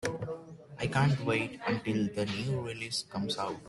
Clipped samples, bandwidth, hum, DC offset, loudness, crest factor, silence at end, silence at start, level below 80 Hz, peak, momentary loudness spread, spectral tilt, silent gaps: under 0.1%; 12 kHz; none; under 0.1%; -33 LUFS; 18 dB; 0 s; 0 s; -62 dBFS; -14 dBFS; 11 LU; -5.5 dB/octave; none